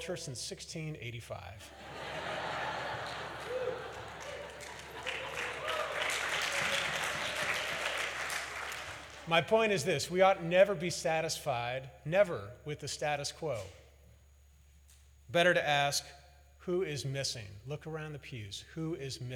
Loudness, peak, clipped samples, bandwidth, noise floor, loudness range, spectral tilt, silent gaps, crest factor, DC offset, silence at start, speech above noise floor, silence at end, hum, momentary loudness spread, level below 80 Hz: -34 LUFS; -14 dBFS; under 0.1%; 19.5 kHz; -61 dBFS; 9 LU; -3.5 dB/octave; none; 22 dB; under 0.1%; 0 s; 28 dB; 0 s; none; 16 LU; -62 dBFS